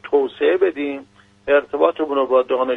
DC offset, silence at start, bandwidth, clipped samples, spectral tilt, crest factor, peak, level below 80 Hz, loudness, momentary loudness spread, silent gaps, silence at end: under 0.1%; 0.05 s; 4 kHz; under 0.1%; -6 dB/octave; 18 dB; -2 dBFS; -58 dBFS; -19 LUFS; 10 LU; none; 0 s